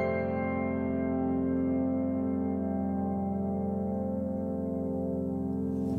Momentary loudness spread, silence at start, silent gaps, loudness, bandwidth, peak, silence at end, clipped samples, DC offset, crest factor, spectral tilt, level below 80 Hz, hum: 3 LU; 0 s; none; -31 LUFS; 4.4 kHz; -20 dBFS; 0 s; under 0.1%; under 0.1%; 12 dB; -11 dB/octave; -60 dBFS; none